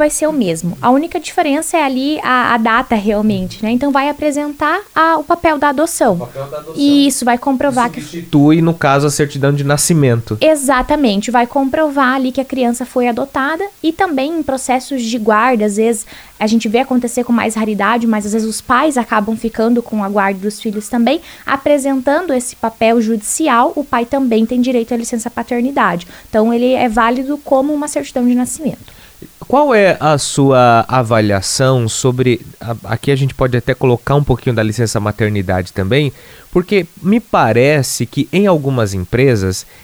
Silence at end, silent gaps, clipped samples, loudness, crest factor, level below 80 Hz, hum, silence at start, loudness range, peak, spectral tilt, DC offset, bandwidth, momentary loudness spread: 0.2 s; none; under 0.1%; -14 LUFS; 14 dB; -40 dBFS; none; 0 s; 3 LU; 0 dBFS; -5 dB/octave; under 0.1%; over 20 kHz; 7 LU